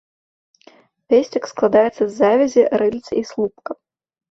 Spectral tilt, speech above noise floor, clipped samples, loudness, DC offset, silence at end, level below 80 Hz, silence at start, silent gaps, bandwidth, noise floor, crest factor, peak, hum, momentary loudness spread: -5.5 dB/octave; 34 dB; under 0.1%; -17 LUFS; under 0.1%; 0.55 s; -60 dBFS; 1.1 s; none; 7.8 kHz; -51 dBFS; 16 dB; -2 dBFS; none; 11 LU